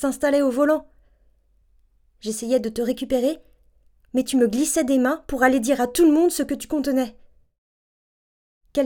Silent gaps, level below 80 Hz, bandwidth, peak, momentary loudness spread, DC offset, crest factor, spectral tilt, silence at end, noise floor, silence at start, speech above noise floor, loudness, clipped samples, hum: 7.58-8.61 s; -52 dBFS; 19 kHz; -2 dBFS; 10 LU; under 0.1%; 20 dB; -3.5 dB/octave; 0 s; -60 dBFS; 0 s; 39 dB; -21 LUFS; under 0.1%; none